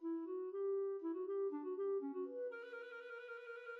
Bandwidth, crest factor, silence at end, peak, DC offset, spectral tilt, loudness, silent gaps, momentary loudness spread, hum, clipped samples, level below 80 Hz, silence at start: 4.4 kHz; 10 dB; 0 s; -34 dBFS; under 0.1%; -5.5 dB/octave; -44 LUFS; none; 10 LU; none; under 0.1%; under -90 dBFS; 0 s